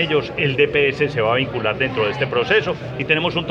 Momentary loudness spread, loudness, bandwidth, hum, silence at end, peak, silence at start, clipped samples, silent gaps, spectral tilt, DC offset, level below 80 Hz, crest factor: 4 LU; -19 LUFS; 7.4 kHz; none; 0 s; -2 dBFS; 0 s; under 0.1%; none; -6.5 dB/octave; under 0.1%; -46 dBFS; 18 dB